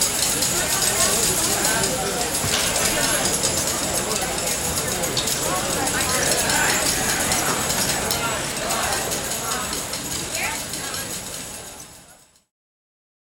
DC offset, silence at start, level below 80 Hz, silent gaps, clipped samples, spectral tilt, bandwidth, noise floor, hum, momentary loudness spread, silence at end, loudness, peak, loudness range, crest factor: under 0.1%; 0 s; -42 dBFS; none; under 0.1%; -1.5 dB/octave; over 20 kHz; -50 dBFS; none; 9 LU; 1.1 s; -20 LUFS; -6 dBFS; 7 LU; 18 dB